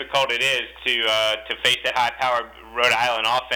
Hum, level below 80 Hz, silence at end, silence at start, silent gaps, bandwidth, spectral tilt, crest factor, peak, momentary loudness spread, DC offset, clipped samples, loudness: none; -54 dBFS; 0 s; 0 s; none; over 20 kHz; -1 dB/octave; 14 dB; -6 dBFS; 5 LU; under 0.1%; under 0.1%; -20 LUFS